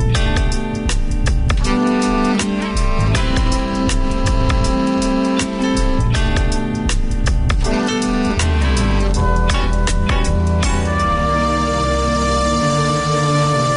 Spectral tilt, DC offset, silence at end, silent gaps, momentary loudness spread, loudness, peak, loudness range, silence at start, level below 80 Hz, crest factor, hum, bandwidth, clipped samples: -5.5 dB/octave; under 0.1%; 0 s; none; 4 LU; -17 LUFS; -2 dBFS; 1 LU; 0 s; -18 dBFS; 12 dB; none; 11 kHz; under 0.1%